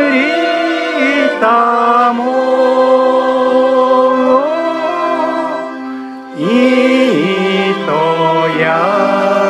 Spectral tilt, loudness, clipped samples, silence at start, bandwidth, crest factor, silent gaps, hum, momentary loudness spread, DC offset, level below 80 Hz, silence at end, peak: -5.5 dB/octave; -12 LUFS; under 0.1%; 0 s; 10.5 kHz; 12 dB; none; none; 6 LU; under 0.1%; -66 dBFS; 0 s; 0 dBFS